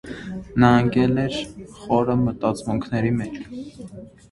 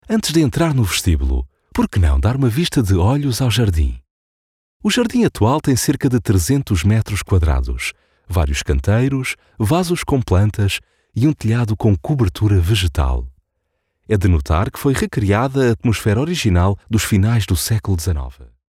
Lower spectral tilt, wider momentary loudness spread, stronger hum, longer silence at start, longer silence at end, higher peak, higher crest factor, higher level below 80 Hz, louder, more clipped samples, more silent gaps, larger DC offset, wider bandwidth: first, -7.5 dB/octave vs -6 dB/octave; first, 21 LU vs 7 LU; neither; about the same, 0.05 s vs 0.1 s; about the same, 0.25 s vs 0.25 s; about the same, 0 dBFS vs -2 dBFS; first, 22 dB vs 14 dB; second, -46 dBFS vs -28 dBFS; second, -21 LUFS vs -17 LUFS; neither; second, none vs 4.10-4.80 s; neither; second, 11.5 kHz vs 16 kHz